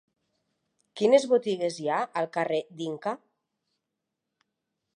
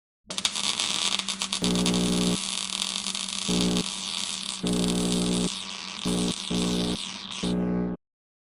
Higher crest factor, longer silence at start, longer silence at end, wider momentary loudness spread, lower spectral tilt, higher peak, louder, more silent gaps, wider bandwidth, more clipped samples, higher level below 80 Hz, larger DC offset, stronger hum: about the same, 22 dB vs 20 dB; first, 0.95 s vs 0.3 s; first, 1.8 s vs 0.6 s; first, 13 LU vs 7 LU; first, -5 dB/octave vs -3.5 dB/octave; about the same, -8 dBFS vs -8 dBFS; about the same, -27 LUFS vs -27 LUFS; neither; second, 10.5 kHz vs 15.5 kHz; neither; second, -86 dBFS vs -48 dBFS; neither; neither